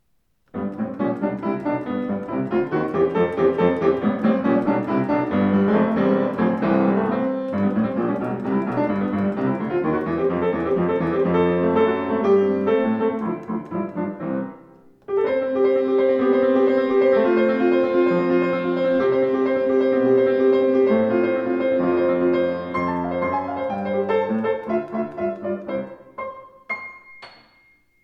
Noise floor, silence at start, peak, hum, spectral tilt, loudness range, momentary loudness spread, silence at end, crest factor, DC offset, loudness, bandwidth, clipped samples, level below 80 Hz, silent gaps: -67 dBFS; 0.55 s; -6 dBFS; none; -9.5 dB/octave; 6 LU; 10 LU; 0.75 s; 14 dB; under 0.1%; -21 LUFS; 5.8 kHz; under 0.1%; -56 dBFS; none